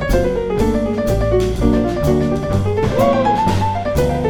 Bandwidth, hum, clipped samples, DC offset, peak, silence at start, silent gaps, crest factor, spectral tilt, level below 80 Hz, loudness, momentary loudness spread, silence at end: 19 kHz; none; under 0.1%; under 0.1%; -2 dBFS; 0 s; none; 14 dB; -7 dB/octave; -24 dBFS; -17 LUFS; 4 LU; 0 s